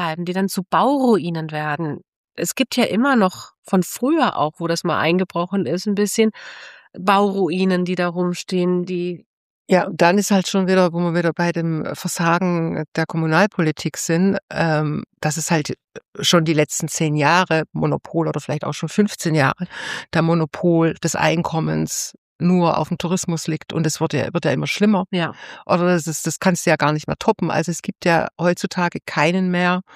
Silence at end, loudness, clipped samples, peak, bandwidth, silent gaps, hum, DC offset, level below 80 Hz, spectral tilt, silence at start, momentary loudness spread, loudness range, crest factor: 0.15 s; -19 LUFS; under 0.1%; -2 dBFS; 15.5 kHz; 2.08-2.28 s, 3.58-3.63 s, 9.26-9.65 s, 12.88-12.92 s, 14.42-14.48 s, 15.84-15.88 s, 16.08-16.13 s, 22.18-22.39 s; none; under 0.1%; -58 dBFS; -5 dB/octave; 0 s; 8 LU; 2 LU; 18 dB